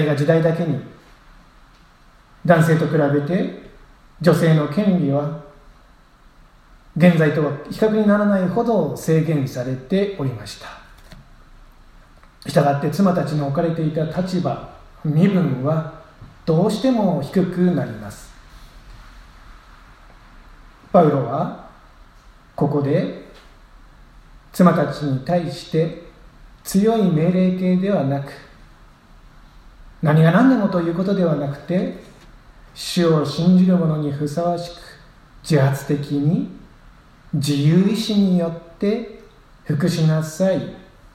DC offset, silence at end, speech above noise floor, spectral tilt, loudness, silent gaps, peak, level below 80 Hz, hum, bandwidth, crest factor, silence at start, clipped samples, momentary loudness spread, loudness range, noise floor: under 0.1%; 0.35 s; 32 dB; -7.5 dB/octave; -19 LUFS; none; 0 dBFS; -48 dBFS; none; 15 kHz; 20 dB; 0 s; under 0.1%; 15 LU; 4 LU; -50 dBFS